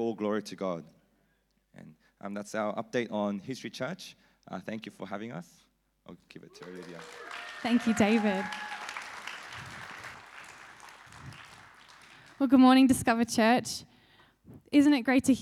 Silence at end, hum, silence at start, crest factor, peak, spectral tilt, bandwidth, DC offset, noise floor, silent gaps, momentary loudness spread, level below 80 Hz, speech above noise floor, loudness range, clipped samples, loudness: 0 s; none; 0 s; 20 dB; -12 dBFS; -4.5 dB/octave; 14 kHz; under 0.1%; -73 dBFS; none; 24 LU; -68 dBFS; 44 dB; 17 LU; under 0.1%; -28 LUFS